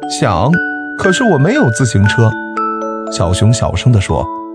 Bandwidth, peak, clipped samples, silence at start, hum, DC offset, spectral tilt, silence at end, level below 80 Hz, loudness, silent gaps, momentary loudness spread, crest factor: 10.5 kHz; 0 dBFS; under 0.1%; 0 s; none; under 0.1%; -5.5 dB/octave; 0 s; -34 dBFS; -13 LUFS; none; 7 LU; 12 dB